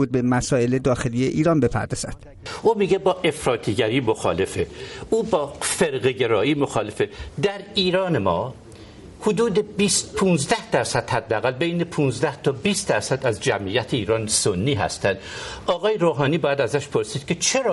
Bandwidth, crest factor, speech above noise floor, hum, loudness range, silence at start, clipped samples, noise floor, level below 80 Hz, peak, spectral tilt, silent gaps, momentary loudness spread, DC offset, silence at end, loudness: 11.5 kHz; 16 dB; 20 dB; none; 1 LU; 0 s; under 0.1%; -42 dBFS; -48 dBFS; -6 dBFS; -4.5 dB/octave; none; 7 LU; under 0.1%; 0 s; -22 LUFS